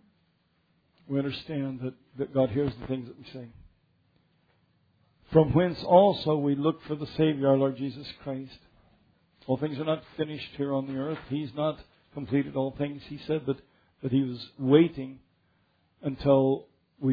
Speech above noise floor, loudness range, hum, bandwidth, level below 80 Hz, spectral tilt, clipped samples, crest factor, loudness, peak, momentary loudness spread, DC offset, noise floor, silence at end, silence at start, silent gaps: 43 dB; 8 LU; none; 5 kHz; -56 dBFS; -10 dB/octave; under 0.1%; 22 dB; -28 LUFS; -6 dBFS; 17 LU; under 0.1%; -70 dBFS; 0 s; 1.1 s; none